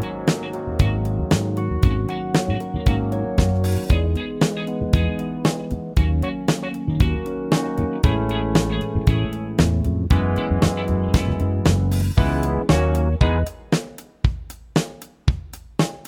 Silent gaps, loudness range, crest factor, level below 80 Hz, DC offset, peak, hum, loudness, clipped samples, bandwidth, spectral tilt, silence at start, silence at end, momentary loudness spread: none; 2 LU; 18 dB; -26 dBFS; under 0.1%; -2 dBFS; none; -21 LUFS; under 0.1%; 17.5 kHz; -6.5 dB/octave; 0 s; 0.05 s; 6 LU